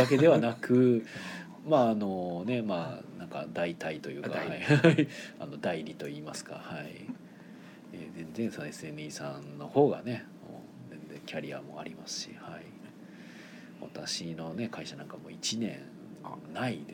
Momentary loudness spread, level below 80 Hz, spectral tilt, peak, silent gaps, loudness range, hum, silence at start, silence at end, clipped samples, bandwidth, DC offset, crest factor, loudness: 23 LU; -74 dBFS; -6 dB/octave; -8 dBFS; none; 11 LU; none; 0 s; 0 s; under 0.1%; 18 kHz; under 0.1%; 24 dB; -31 LUFS